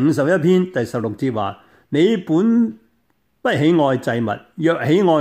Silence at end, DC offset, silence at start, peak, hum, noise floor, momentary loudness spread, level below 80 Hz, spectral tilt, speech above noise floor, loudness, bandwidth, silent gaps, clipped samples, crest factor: 0 s; under 0.1%; 0 s; -4 dBFS; none; -65 dBFS; 8 LU; -62 dBFS; -7 dB/octave; 49 dB; -18 LUFS; 13.5 kHz; none; under 0.1%; 14 dB